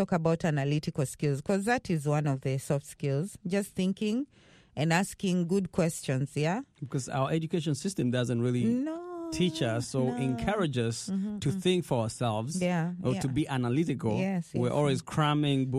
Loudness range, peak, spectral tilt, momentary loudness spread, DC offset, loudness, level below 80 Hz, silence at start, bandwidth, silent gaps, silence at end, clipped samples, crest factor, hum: 1 LU; -10 dBFS; -6 dB/octave; 5 LU; under 0.1%; -30 LUFS; -58 dBFS; 0 s; 14 kHz; none; 0 s; under 0.1%; 20 dB; none